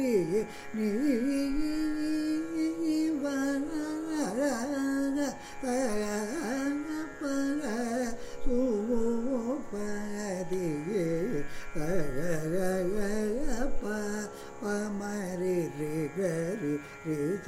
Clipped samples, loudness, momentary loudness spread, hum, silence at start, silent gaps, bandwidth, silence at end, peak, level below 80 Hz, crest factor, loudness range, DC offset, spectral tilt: under 0.1%; -32 LUFS; 6 LU; none; 0 s; none; 15.5 kHz; 0 s; -16 dBFS; -44 dBFS; 14 dB; 3 LU; under 0.1%; -5.5 dB/octave